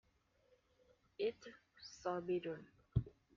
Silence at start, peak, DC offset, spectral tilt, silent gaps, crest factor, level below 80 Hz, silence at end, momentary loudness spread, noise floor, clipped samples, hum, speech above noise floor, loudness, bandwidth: 1.2 s; -22 dBFS; under 0.1%; -6.5 dB/octave; none; 24 dB; -60 dBFS; 0.3 s; 17 LU; -76 dBFS; under 0.1%; none; 33 dB; -44 LUFS; 7.2 kHz